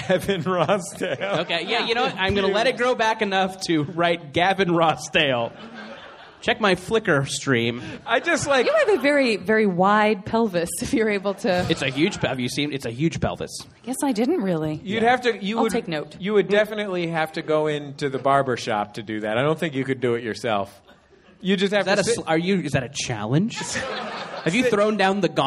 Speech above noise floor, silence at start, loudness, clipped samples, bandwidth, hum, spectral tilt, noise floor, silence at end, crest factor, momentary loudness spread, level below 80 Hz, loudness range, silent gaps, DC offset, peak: 30 dB; 0 s; -22 LUFS; under 0.1%; 14.5 kHz; none; -4.5 dB/octave; -52 dBFS; 0 s; 18 dB; 8 LU; -52 dBFS; 4 LU; none; under 0.1%; -4 dBFS